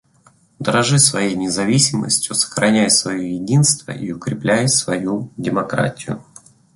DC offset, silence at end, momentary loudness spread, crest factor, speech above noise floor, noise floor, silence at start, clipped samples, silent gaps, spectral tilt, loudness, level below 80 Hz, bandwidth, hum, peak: under 0.1%; 0.55 s; 12 LU; 18 dB; 36 dB; -54 dBFS; 0.6 s; under 0.1%; none; -3.5 dB/octave; -17 LUFS; -54 dBFS; 12 kHz; none; 0 dBFS